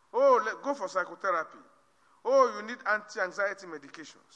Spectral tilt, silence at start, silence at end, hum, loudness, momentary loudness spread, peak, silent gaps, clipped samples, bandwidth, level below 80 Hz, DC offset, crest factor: -3 dB/octave; 0.15 s; 0.25 s; none; -29 LUFS; 19 LU; -12 dBFS; none; under 0.1%; 8.8 kHz; -88 dBFS; under 0.1%; 18 dB